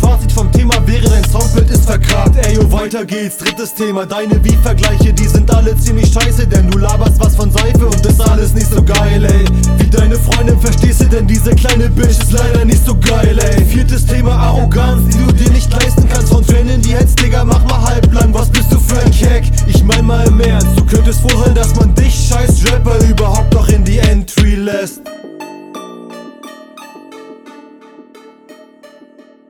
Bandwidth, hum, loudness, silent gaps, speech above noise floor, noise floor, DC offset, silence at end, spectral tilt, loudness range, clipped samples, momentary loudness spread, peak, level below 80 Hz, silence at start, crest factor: 18 kHz; none; -11 LUFS; none; 33 dB; -41 dBFS; under 0.1%; 1.5 s; -5.5 dB/octave; 3 LU; under 0.1%; 6 LU; 0 dBFS; -12 dBFS; 0 s; 8 dB